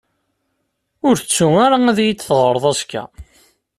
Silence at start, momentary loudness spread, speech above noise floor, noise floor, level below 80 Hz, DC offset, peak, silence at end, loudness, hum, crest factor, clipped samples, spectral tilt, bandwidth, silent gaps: 1.05 s; 13 LU; 56 dB; -71 dBFS; -50 dBFS; under 0.1%; -2 dBFS; 0.55 s; -15 LUFS; none; 14 dB; under 0.1%; -4.5 dB/octave; 14 kHz; none